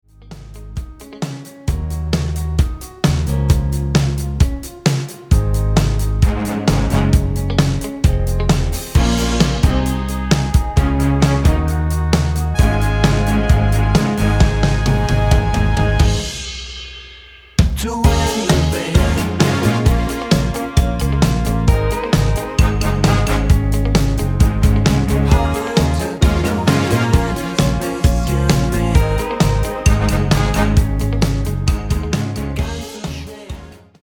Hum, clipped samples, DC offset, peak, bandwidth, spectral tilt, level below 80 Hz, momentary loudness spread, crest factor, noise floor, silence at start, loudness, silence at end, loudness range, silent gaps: none; under 0.1%; under 0.1%; 0 dBFS; 19 kHz; -6 dB/octave; -20 dBFS; 8 LU; 16 dB; -40 dBFS; 0.25 s; -17 LUFS; 0.25 s; 3 LU; none